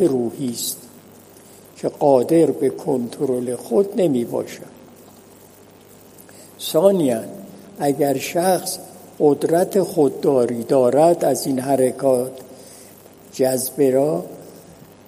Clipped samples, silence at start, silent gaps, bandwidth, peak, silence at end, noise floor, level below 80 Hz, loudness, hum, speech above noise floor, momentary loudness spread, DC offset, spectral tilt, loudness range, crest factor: under 0.1%; 0 s; none; 15.5 kHz; 0 dBFS; 0.5 s; -46 dBFS; -66 dBFS; -19 LUFS; none; 28 dB; 17 LU; under 0.1%; -5.5 dB/octave; 6 LU; 20 dB